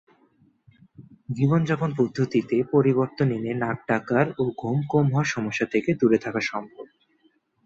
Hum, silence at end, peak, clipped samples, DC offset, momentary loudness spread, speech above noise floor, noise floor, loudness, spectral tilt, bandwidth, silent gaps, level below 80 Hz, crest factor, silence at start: none; 0.8 s; -6 dBFS; under 0.1%; under 0.1%; 7 LU; 42 dB; -65 dBFS; -24 LUFS; -7.5 dB/octave; 7.8 kHz; none; -62 dBFS; 18 dB; 1 s